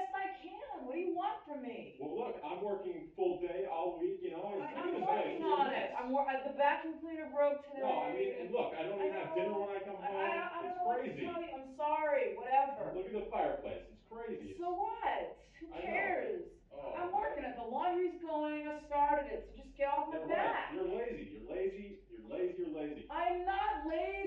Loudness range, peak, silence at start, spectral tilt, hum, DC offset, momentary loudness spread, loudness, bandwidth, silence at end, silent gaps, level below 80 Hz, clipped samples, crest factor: 4 LU; -20 dBFS; 0 s; -7 dB/octave; none; under 0.1%; 12 LU; -38 LUFS; 7.2 kHz; 0 s; none; -64 dBFS; under 0.1%; 18 dB